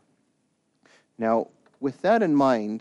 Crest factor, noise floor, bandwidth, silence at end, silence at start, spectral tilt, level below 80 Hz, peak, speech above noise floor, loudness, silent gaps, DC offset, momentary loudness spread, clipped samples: 16 dB; -71 dBFS; 9.2 kHz; 0 s; 1.2 s; -7 dB/octave; -74 dBFS; -10 dBFS; 49 dB; -24 LUFS; none; under 0.1%; 12 LU; under 0.1%